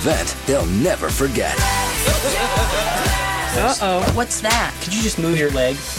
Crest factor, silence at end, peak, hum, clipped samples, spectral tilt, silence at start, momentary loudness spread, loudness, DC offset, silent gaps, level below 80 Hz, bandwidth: 16 dB; 0 s; -2 dBFS; none; under 0.1%; -3.5 dB/octave; 0 s; 2 LU; -18 LUFS; 0.2%; none; -28 dBFS; 17 kHz